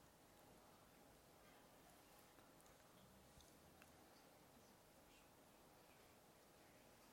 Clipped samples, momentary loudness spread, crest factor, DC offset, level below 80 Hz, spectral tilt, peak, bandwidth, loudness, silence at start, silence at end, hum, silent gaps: under 0.1%; 2 LU; 22 dB; under 0.1%; -82 dBFS; -3.5 dB/octave; -46 dBFS; 16.5 kHz; -68 LUFS; 0 s; 0 s; none; none